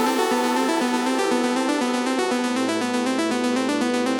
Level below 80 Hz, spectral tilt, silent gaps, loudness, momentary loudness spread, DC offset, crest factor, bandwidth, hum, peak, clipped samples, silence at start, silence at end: -70 dBFS; -3 dB/octave; none; -22 LUFS; 2 LU; under 0.1%; 12 dB; 19 kHz; none; -8 dBFS; under 0.1%; 0 s; 0 s